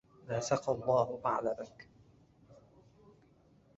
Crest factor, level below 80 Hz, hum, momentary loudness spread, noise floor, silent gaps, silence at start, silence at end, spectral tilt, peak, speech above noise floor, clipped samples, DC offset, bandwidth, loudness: 22 dB; -68 dBFS; none; 10 LU; -65 dBFS; none; 0.25 s; 1.25 s; -5.5 dB/octave; -14 dBFS; 32 dB; under 0.1%; under 0.1%; 7.6 kHz; -34 LUFS